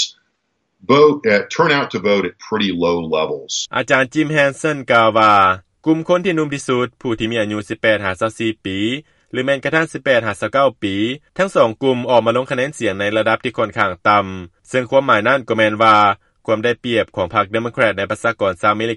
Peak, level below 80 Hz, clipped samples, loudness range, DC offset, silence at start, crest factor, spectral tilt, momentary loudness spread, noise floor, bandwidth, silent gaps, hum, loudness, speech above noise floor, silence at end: 0 dBFS; -54 dBFS; under 0.1%; 4 LU; under 0.1%; 0 s; 16 dB; -5 dB/octave; 9 LU; -69 dBFS; 11.5 kHz; none; none; -16 LUFS; 53 dB; 0 s